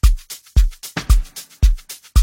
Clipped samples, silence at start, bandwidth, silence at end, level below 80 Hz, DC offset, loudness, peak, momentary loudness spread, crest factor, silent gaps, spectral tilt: under 0.1%; 0.05 s; 16.5 kHz; 0 s; -16 dBFS; under 0.1%; -21 LUFS; 0 dBFS; 9 LU; 14 dB; none; -4.5 dB/octave